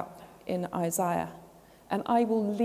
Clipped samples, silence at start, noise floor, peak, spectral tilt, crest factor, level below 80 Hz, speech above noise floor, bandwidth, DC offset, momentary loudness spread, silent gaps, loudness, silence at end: under 0.1%; 0 s; -54 dBFS; -14 dBFS; -5.5 dB/octave; 16 dB; -64 dBFS; 26 dB; 16 kHz; under 0.1%; 14 LU; none; -30 LUFS; 0 s